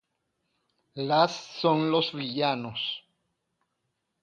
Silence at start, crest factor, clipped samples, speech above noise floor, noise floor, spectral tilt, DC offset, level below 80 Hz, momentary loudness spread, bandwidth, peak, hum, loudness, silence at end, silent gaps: 0.95 s; 22 dB; under 0.1%; 53 dB; -80 dBFS; -5.5 dB/octave; under 0.1%; -74 dBFS; 11 LU; 9.2 kHz; -8 dBFS; none; -27 LUFS; 1.25 s; none